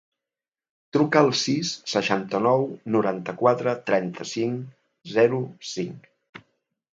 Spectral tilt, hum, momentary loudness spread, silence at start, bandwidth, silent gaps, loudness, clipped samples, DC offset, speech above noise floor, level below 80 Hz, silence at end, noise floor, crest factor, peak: -5 dB/octave; none; 11 LU; 0.95 s; 7.8 kHz; 6.29-6.33 s; -24 LUFS; under 0.1%; under 0.1%; over 67 dB; -70 dBFS; 0.6 s; under -90 dBFS; 20 dB; -4 dBFS